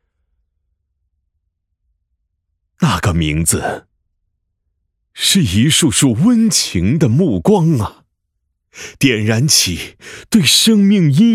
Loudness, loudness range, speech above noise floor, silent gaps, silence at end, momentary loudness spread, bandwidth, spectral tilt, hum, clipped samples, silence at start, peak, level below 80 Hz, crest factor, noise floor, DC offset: -13 LUFS; 7 LU; 58 dB; none; 0 s; 11 LU; 16.5 kHz; -4 dB/octave; none; under 0.1%; 2.8 s; 0 dBFS; -42 dBFS; 16 dB; -71 dBFS; under 0.1%